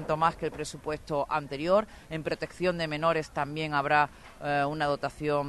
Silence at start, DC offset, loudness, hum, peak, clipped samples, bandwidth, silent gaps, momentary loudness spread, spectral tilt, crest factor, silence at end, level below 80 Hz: 0 s; under 0.1%; -30 LUFS; none; -10 dBFS; under 0.1%; 12 kHz; none; 9 LU; -5.5 dB/octave; 20 dB; 0 s; -54 dBFS